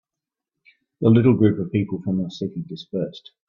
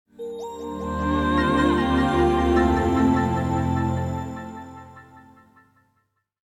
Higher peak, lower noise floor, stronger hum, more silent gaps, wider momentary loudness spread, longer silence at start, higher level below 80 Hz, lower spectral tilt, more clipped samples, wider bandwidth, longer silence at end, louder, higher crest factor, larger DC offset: first, -4 dBFS vs -8 dBFS; first, -87 dBFS vs -71 dBFS; neither; neither; about the same, 14 LU vs 16 LU; first, 1 s vs 0.2 s; second, -58 dBFS vs -36 dBFS; first, -9.5 dB/octave vs -7 dB/octave; neither; second, 7 kHz vs 14 kHz; second, 0.3 s vs 1.25 s; about the same, -21 LUFS vs -22 LUFS; about the same, 18 dB vs 16 dB; neither